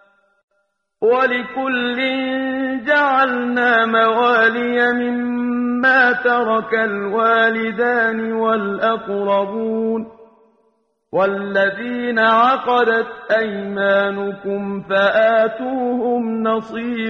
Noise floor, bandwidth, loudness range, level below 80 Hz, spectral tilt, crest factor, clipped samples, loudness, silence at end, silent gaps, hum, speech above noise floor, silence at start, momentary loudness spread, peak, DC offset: -69 dBFS; 6.8 kHz; 5 LU; -62 dBFS; -6.5 dB/octave; 16 dB; under 0.1%; -17 LUFS; 0 s; none; none; 51 dB; 1 s; 8 LU; -2 dBFS; under 0.1%